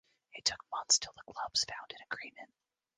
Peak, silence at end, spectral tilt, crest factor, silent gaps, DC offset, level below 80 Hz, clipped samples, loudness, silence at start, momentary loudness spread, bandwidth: -14 dBFS; 0.5 s; 2 dB/octave; 24 dB; none; under 0.1%; -72 dBFS; under 0.1%; -34 LUFS; 0.35 s; 16 LU; 10.5 kHz